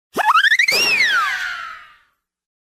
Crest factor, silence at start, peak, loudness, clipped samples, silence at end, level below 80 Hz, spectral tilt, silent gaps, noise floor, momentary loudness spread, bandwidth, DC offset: 14 dB; 0.15 s; -4 dBFS; -14 LUFS; under 0.1%; 0.95 s; -62 dBFS; 0.5 dB/octave; none; -61 dBFS; 15 LU; 16 kHz; under 0.1%